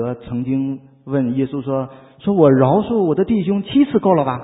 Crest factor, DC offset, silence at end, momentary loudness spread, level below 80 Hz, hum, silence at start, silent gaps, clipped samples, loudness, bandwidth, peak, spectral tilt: 16 dB; under 0.1%; 0 s; 12 LU; -50 dBFS; none; 0 s; none; under 0.1%; -17 LUFS; 4 kHz; 0 dBFS; -13 dB/octave